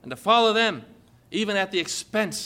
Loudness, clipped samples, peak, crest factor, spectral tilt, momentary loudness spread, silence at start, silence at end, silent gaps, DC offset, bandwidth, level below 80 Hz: -23 LUFS; under 0.1%; -6 dBFS; 18 dB; -3 dB/octave; 11 LU; 0.05 s; 0 s; none; under 0.1%; 16.5 kHz; -66 dBFS